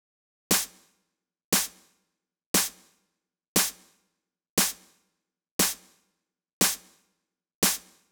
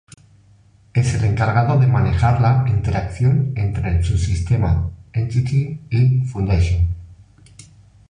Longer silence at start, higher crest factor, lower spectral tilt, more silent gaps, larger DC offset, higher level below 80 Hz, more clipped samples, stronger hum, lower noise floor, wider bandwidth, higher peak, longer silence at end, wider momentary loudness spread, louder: second, 0.5 s vs 0.95 s; first, 24 dB vs 14 dB; second, -1.5 dB/octave vs -7.5 dB/octave; first, 1.44-1.52 s, 2.46-2.54 s, 3.48-3.55 s, 4.50-4.57 s, 5.51-5.59 s, 6.53-6.61 s, 7.55-7.62 s vs none; neither; second, -60 dBFS vs -28 dBFS; neither; neither; first, -81 dBFS vs -51 dBFS; first, over 20 kHz vs 10 kHz; second, -8 dBFS vs -4 dBFS; second, 0.3 s vs 0.95 s; first, 10 LU vs 7 LU; second, -26 LUFS vs -18 LUFS